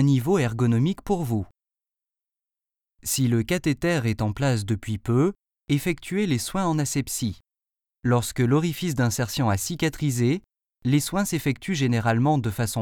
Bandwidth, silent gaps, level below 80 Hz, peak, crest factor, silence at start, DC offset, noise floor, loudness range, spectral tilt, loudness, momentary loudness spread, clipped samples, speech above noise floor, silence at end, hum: 19.5 kHz; none; -50 dBFS; -8 dBFS; 18 dB; 0 s; under 0.1%; -90 dBFS; 3 LU; -5.5 dB/octave; -24 LUFS; 6 LU; under 0.1%; 66 dB; 0 s; none